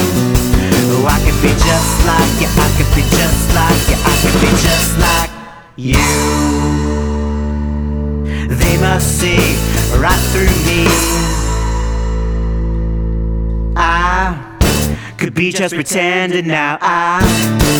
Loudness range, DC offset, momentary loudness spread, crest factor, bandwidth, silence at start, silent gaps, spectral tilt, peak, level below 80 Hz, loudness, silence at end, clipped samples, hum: 4 LU; under 0.1%; 7 LU; 12 dB; over 20 kHz; 0 s; none; -4.5 dB/octave; 0 dBFS; -18 dBFS; -13 LUFS; 0 s; under 0.1%; none